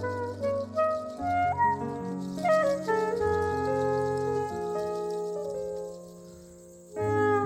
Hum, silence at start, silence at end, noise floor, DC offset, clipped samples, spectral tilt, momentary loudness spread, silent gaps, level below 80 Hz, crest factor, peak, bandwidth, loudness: none; 0 s; 0 s; -49 dBFS; under 0.1%; under 0.1%; -6.5 dB/octave; 16 LU; none; -56 dBFS; 14 dB; -14 dBFS; 15.5 kHz; -29 LUFS